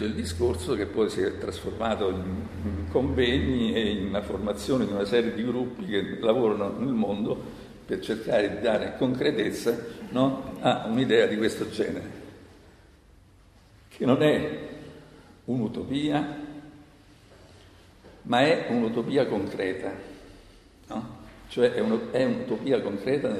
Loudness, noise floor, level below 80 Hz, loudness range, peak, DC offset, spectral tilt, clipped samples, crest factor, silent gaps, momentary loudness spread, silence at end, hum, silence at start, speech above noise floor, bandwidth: -27 LUFS; -55 dBFS; -46 dBFS; 4 LU; -8 dBFS; under 0.1%; -6 dB/octave; under 0.1%; 20 dB; none; 14 LU; 0 s; none; 0 s; 29 dB; 14 kHz